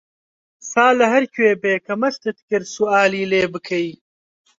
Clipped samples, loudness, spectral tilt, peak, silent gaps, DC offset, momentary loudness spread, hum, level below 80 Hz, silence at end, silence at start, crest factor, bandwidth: under 0.1%; -18 LUFS; -4.5 dB/octave; -2 dBFS; 2.42-2.48 s; under 0.1%; 9 LU; none; -62 dBFS; 0.7 s; 0.65 s; 18 dB; 7.8 kHz